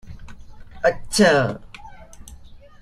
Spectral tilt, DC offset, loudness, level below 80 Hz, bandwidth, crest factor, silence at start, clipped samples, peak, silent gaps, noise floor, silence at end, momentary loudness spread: -4.5 dB/octave; under 0.1%; -19 LUFS; -44 dBFS; 14.5 kHz; 20 dB; 0.05 s; under 0.1%; -2 dBFS; none; -42 dBFS; 0.25 s; 25 LU